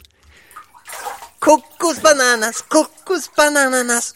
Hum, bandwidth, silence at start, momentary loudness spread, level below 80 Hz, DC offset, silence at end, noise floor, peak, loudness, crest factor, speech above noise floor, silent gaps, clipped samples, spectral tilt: none; 17 kHz; 0.55 s; 16 LU; -58 dBFS; 0.1%; 0.05 s; -48 dBFS; 0 dBFS; -15 LUFS; 18 dB; 33 dB; none; under 0.1%; -1 dB/octave